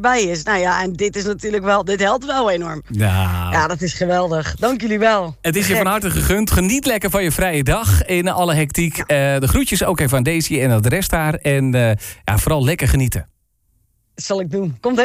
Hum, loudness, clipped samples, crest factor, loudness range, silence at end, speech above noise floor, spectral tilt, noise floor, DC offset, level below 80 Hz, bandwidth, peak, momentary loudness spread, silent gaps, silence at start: none; -17 LUFS; under 0.1%; 12 dB; 2 LU; 0 s; 46 dB; -5 dB/octave; -63 dBFS; under 0.1%; -30 dBFS; 16 kHz; -4 dBFS; 5 LU; none; 0 s